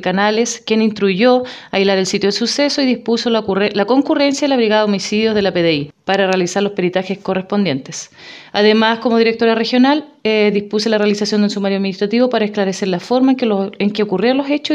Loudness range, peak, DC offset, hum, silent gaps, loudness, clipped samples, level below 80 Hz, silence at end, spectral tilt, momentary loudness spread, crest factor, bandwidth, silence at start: 2 LU; 0 dBFS; under 0.1%; none; none; -15 LUFS; under 0.1%; -58 dBFS; 0 s; -4.5 dB/octave; 5 LU; 14 dB; 11 kHz; 0 s